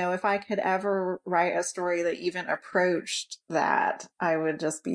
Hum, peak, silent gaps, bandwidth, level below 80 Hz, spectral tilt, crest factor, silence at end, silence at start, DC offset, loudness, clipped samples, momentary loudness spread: none; -8 dBFS; none; 10.5 kHz; -74 dBFS; -4 dB/octave; 20 dB; 0 s; 0 s; under 0.1%; -28 LUFS; under 0.1%; 6 LU